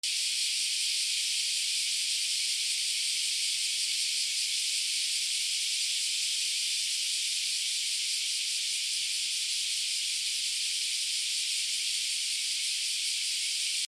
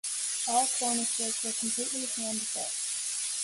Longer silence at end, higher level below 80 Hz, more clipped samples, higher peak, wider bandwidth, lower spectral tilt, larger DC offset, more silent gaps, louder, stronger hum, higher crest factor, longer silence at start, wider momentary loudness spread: about the same, 0.05 s vs 0 s; about the same, -78 dBFS vs -78 dBFS; neither; about the same, -16 dBFS vs -14 dBFS; first, 16 kHz vs 12 kHz; second, 6.5 dB/octave vs 0 dB/octave; neither; neither; about the same, -28 LUFS vs -29 LUFS; neither; about the same, 14 dB vs 18 dB; about the same, 0.05 s vs 0.05 s; second, 1 LU vs 5 LU